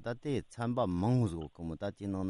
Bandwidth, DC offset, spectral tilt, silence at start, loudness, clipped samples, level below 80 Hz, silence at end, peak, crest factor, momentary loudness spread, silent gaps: 11.5 kHz; under 0.1%; -8 dB/octave; 0 s; -35 LUFS; under 0.1%; -60 dBFS; 0 s; -18 dBFS; 16 dB; 10 LU; none